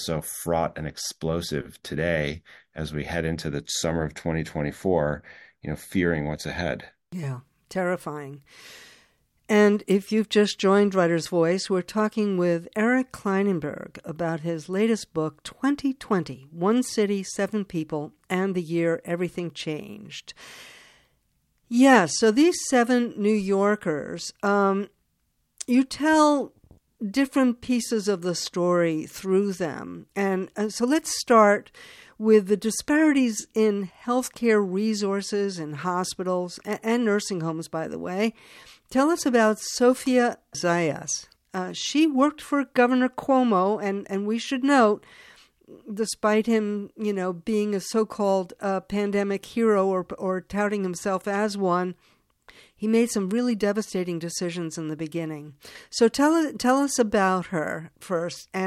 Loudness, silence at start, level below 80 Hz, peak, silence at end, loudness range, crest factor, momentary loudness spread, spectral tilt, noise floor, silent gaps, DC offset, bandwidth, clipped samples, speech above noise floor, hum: -24 LUFS; 0 s; -54 dBFS; -6 dBFS; 0 s; 6 LU; 20 dB; 12 LU; -5 dB/octave; -72 dBFS; none; under 0.1%; 15 kHz; under 0.1%; 48 dB; none